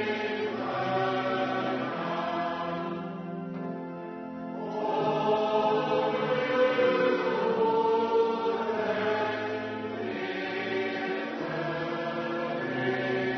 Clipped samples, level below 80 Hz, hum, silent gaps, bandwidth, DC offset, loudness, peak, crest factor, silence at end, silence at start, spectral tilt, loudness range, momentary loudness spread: under 0.1%; -72 dBFS; none; none; 6.4 kHz; under 0.1%; -29 LUFS; -14 dBFS; 16 dB; 0 s; 0 s; -6.5 dB/octave; 6 LU; 11 LU